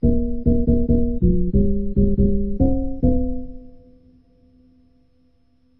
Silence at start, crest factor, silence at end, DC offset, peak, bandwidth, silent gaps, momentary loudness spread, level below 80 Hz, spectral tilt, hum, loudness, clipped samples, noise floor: 0.05 s; 14 dB; 2.1 s; under 0.1%; -4 dBFS; 1 kHz; none; 5 LU; -24 dBFS; -15 dB/octave; none; -20 LUFS; under 0.1%; -61 dBFS